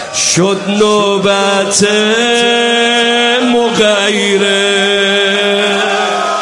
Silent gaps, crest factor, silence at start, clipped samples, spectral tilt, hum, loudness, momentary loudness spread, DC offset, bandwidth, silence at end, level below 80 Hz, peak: none; 10 dB; 0 s; under 0.1%; -2.5 dB/octave; none; -10 LUFS; 2 LU; under 0.1%; 11.5 kHz; 0 s; -54 dBFS; 0 dBFS